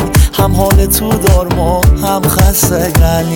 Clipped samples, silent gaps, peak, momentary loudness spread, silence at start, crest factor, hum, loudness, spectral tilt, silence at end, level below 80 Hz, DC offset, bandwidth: under 0.1%; none; 0 dBFS; 2 LU; 0 s; 10 dB; none; -10 LUFS; -5 dB/octave; 0 s; -14 dBFS; under 0.1%; 19 kHz